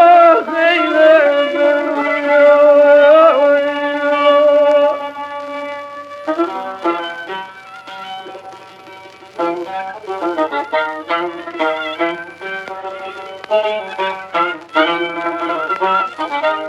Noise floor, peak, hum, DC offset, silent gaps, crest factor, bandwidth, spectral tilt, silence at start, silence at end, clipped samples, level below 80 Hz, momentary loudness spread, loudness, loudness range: -37 dBFS; 0 dBFS; none; under 0.1%; none; 14 dB; 7.8 kHz; -4.5 dB/octave; 0 s; 0 s; under 0.1%; -72 dBFS; 19 LU; -14 LUFS; 14 LU